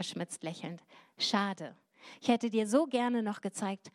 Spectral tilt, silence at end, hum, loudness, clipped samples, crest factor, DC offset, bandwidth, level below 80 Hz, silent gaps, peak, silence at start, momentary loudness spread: -4.5 dB/octave; 0.05 s; none; -33 LUFS; under 0.1%; 20 dB; under 0.1%; 13 kHz; under -90 dBFS; none; -14 dBFS; 0 s; 14 LU